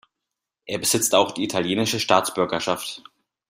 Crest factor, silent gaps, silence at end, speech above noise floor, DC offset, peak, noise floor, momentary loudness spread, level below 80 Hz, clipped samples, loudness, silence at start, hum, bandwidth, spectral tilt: 22 dB; none; 0.5 s; 61 dB; under 0.1%; -2 dBFS; -84 dBFS; 12 LU; -64 dBFS; under 0.1%; -22 LUFS; 0.65 s; none; 16 kHz; -3 dB/octave